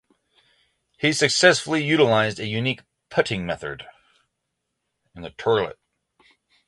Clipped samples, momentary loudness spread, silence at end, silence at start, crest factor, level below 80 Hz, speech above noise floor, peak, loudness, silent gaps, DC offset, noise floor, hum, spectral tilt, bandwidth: under 0.1%; 17 LU; 0.95 s; 1 s; 22 dB; -58 dBFS; 57 dB; -2 dBFS; -21 LUFS; none; under 0.1%; -79 dBFS; none; -4 dB/octave; 11.5 kHz